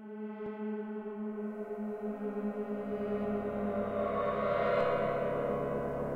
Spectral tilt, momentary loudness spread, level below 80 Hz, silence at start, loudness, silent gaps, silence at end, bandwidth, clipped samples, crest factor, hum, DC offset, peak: -8.5 dB/octave; 10 LU; -58 dBFS; 0 s; -35 LUFS; none; 0 s; 5.4 kHz; under 0.1%; 16 dB; none; under 0.1%; -18 dBFS